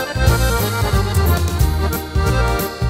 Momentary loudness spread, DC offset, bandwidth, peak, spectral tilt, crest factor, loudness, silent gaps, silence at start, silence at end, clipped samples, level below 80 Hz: 3 LU; under 0.1%; 16.5 kHz; 0 dBFS; -5 dB/octave; 16 dB; -17 LUFS; none; 0 s; 0 s; under 0.1%; -22 dBFS